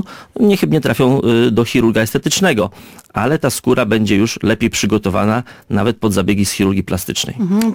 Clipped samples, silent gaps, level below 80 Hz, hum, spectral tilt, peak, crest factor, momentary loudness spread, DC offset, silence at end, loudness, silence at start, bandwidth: under 0.1%; none; -42 dBFS; none; -5 dB/octave; -2 dBFS; 12 dB; 6 LU; under 0.1%; 0 s; -15 LUFS; 0 s; 17 kHz